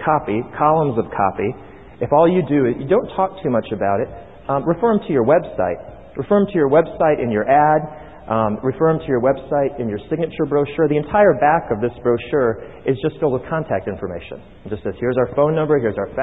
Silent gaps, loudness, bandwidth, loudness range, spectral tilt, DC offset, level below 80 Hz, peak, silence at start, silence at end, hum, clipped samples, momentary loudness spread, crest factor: none; -18 LUFS; 4 kHz; 4 LU; -11 dB/octave; 0.4%; -46 dBFS; -2 dBFS; 0 s; 0 s; none; under 0.1%; 13 LU; 16 dB